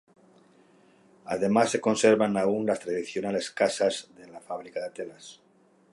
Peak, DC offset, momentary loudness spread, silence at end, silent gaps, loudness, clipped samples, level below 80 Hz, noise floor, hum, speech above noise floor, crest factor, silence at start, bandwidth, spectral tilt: -8 dBFS; under 0.1%; 23 LU; 0.6 s; none; -26 LUFS; under 0.1%; -70 dBFS; -59 dBFS; none; 33 dB; 20 dB; 1.25 s; 11.5 kHz; -4.5 dB/octave